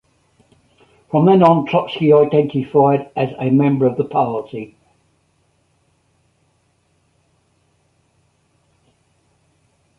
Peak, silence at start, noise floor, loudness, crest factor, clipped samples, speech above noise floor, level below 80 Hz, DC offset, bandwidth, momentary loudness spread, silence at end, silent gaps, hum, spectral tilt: -2 dBFS; 1.15 s; -62 dBFS; -15 LUFS; 18 dB; under 0.1%; 47 dB; -60 dBFS; under 0.1%; 5.6 kHz; 12 LU; 5.35 s; none; none; -9.5 dB/octave